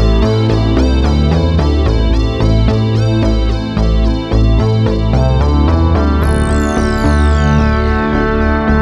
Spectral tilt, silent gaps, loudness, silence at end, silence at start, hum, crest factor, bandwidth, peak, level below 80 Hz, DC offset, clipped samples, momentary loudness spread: -7.5 dB/octave; none; -13 LUFS; 0 s; 0 s; none; 10 dB; 11.5 kHz; 0 dBFS; -14 dBFS; under 0.1%; under 0.1%; 2 LU